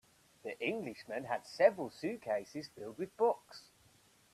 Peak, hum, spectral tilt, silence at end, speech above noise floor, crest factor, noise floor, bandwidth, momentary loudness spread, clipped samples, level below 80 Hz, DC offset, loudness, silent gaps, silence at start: -14 dBFS; none; -5 dB/octave; 0.75 s; 31 dB; 22 dB; -67 dBFS; 14 kHz; 17 LU; under 0.1%; -80 dBFS; under 0.1%; -37 LUFS; none; 0.45 s